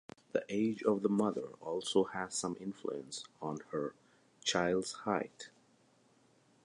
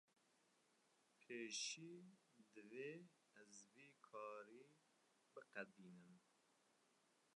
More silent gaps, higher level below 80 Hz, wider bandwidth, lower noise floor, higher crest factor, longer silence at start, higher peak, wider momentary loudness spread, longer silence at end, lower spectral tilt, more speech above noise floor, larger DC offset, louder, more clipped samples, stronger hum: neither; first, -74 dBFS vs under -90 dBFS; about the same, 11 kHz vs 11 kHz; second, -69 dBFS vs -82 dBFS; about the same, 20 dB vs 24 dB; second, 0.35 s vs 0.7 s; first, -16 dBFS vs -36 dBFS; second, 11 LU vs 19 LU; first, 1.15 s vs 0.35 s; first, -4 dB/octave vs -2 dB/octave; first, 33 dB vs 25 dB; neither; first, -36 LUFS vs -55 LUFS; neither; neither